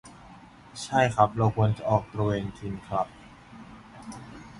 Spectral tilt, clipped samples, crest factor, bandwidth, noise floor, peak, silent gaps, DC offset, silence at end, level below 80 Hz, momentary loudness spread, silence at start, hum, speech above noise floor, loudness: -6.5 dB/octave; under 0.1%; 22 dB; 11.5 kHz; -50 dBFS; -6 dBFS; none; under 0.1%; 0 s; -52 dBFS; 24 LU; 0.05 s; none; 24 dB; -26 LUFS